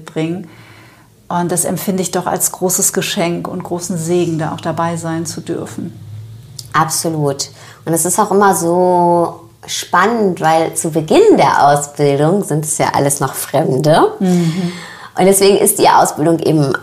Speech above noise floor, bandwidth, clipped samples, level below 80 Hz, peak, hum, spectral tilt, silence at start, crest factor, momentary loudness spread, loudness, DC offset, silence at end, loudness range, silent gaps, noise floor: 30 dB; 15.5 kHz; under 0.1%; -52 dBFS; 0 dBFS; none; -4.5 dB/octave; 0 s; 14 dB; 13 LU; -14 LUFS; under 0.1%; 0 s; 7 LU; none; -44 dBFS